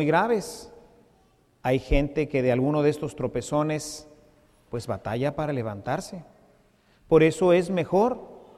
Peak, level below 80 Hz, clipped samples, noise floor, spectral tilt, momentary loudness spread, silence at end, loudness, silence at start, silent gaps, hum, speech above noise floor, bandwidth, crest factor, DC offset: -8 dBFS; -40 dBFS; under 0.1%; -62 dBFS; -6.5 dB/octave; 16 LU; 0.2 s; -25 LUFS; 0 s; none; none; 38 dB; 14.5 kHz; 18 dB; under 0.1%